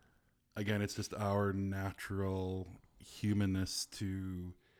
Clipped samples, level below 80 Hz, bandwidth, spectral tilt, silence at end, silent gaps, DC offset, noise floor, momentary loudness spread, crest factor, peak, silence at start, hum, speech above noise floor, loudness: under 0.1%; -64 dBFS; 16.5 kHz; -5.5 dB/octave; 0.25 s; none; under 0.1%; -73 dBFS; 12 LU; 16 dB; -22 dBFS; 0.55 s; none; 35 dB; -38 LUFS